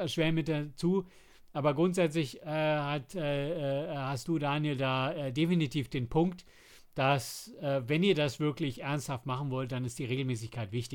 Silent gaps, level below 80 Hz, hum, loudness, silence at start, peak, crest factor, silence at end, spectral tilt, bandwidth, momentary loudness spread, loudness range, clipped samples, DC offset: none; -58 dBFS; none; -32 LUFS; 0 s; -14 dBFS; 18 dB; 0 s; -6 dB/octave; 18 kHz; 8 LU; 1 LU; under 0.1%; under 0.1%